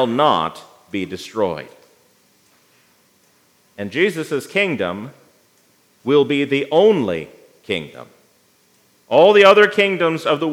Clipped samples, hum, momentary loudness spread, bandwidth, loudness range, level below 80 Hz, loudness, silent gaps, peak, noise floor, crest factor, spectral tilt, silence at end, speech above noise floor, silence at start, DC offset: under 0.1%; none; 19 LU; 14 kHz; 11 LU; -68 dBFS; -16 LUFS; none; 0 dBFS; -57 dBFS; 18 dB; -5 dB/octave; 0 s; 41 dB; 0 s; under 0.1%